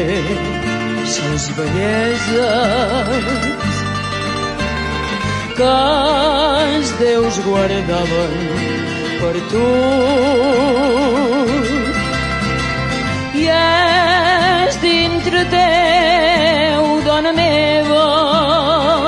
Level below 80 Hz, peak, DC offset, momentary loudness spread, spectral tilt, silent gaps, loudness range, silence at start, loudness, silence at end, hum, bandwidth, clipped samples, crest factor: -34 dBFS; -2 dBFS; under 0.1%; 8 LU; -4.5 dB/octave; none; 4 LU; 0 s; -15 LUFS; 0 s; none; 11.5 kHz; under 0.1%; 12 dB